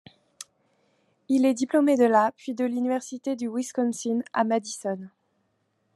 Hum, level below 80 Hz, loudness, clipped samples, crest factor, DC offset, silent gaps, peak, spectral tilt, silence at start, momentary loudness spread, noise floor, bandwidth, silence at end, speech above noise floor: none; -84 dBFS; -25 LUFS; under 0.1%; 18 dB; under 0.1%; none; -8 dBFS; -4.5 dB/octave; 0.4 s; 15 LU; -72 dBFS; 12.5 kHz; 0.9 s; 48 dB